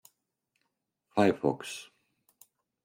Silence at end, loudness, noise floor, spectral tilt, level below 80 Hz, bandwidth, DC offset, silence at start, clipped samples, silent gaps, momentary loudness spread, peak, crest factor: 1 s; -30 LUFS; -81 dBFS; -5.5 dB/octave; -74 dBFS; 16.5 kHz; under 0.1%; 1.15 s; under 0.1%; none; 15 LU; -12 dBFS; 22 dB